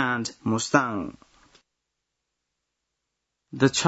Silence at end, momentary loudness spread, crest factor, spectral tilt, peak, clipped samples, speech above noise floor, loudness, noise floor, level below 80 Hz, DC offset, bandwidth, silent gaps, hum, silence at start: 0 s; 15 LU; 24 dB; -4 dB/octave; -4 dBFS; under 0.1%; 57 dB; -25 LUFS; -82 dBFS; -64 dBFS; under 0.1%; 8 kHz; none; 60 Hz at -65 dBFS; 0 s